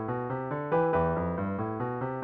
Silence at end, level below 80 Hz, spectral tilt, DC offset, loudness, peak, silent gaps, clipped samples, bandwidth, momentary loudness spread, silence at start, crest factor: 0 s; -52 dBFS; -8 dB/octave; under 0.1%; -30 LUFS; -16 dBFS; none; under 0.1%; 4.1 kHz; 6 LU; 0 s; 14 dB